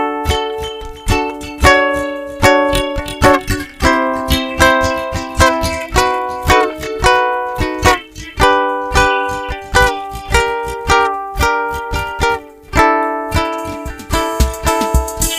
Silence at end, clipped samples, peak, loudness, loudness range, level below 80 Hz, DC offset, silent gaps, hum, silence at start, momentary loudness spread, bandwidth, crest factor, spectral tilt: 0 s; under 0.1%; 0 dBFS; -15 LUFS; 3 LU; -24 dBFS; under 0.1%; none; none; 0 s; 9 LU; 16.5 kHz; 14 dB; -4 dB/octave